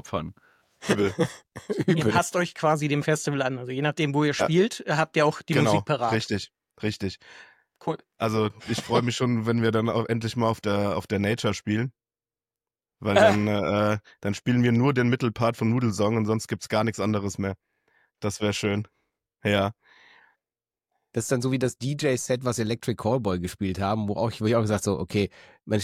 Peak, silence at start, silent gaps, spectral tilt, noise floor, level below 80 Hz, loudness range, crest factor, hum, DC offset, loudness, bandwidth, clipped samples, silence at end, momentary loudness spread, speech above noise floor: -6 dBFS; 0.05 s; none; -5.5 dB/octave; under -90 dBFS; -58 dBFS; 5 LU; 20 dB; none; under 0.1%; -25 LUFS; 15 kHz; under 0.1%; 0 s; 10 LU; over 65 dB